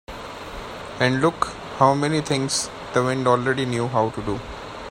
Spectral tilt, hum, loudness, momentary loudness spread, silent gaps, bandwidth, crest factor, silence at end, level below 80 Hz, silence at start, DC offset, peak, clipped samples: -4.5 dB/octave; none; -22 LUFS; 15 LU; none; 16 kHz; 22 dB; 0 s; -46 dBFS; 0.1 s; under 0.1%; 0 dBFS; under 0.1%